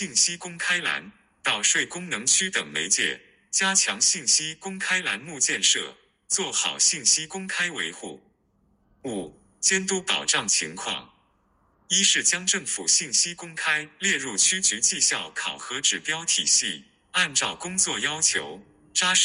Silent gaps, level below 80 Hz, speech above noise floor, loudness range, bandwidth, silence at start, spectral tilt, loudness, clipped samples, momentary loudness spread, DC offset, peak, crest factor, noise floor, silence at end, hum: none; -68 dBFS; 41 dB; 4 LU; 16 kHz; 0 s; 0 dB/octave; -22 LUFS; under 0.1%; 12 LU; under 0.1%; -6 dBFS; 20 dB; -66 dBFS; 0 s; none